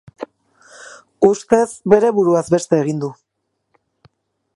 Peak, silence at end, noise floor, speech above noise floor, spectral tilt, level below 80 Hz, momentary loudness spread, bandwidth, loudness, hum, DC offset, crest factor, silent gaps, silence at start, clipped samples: 0 dBFS; 1.45 s; -73 dBFS; 58 dB; -6.5 dB/octave; -58 dBFS; 21 LU; 11.5 kHz; -16 LUFS; none; under 0.1%; 18 dB; none; 0.2 s; under 0.1%